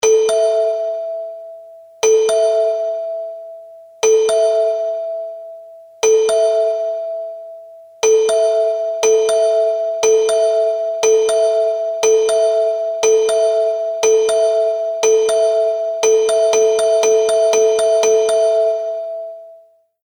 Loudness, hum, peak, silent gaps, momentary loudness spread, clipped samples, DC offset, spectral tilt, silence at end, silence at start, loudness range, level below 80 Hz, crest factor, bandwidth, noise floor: -15 LUFS; none; -4 dBFS; none; 13 LU; under 0.1%; under 0.1%; 0 dB/octave; 0.5 s; 0.05 s; 5 LU; -66 dBFS; 12 dB; 18.5 kHz; -48 dBFS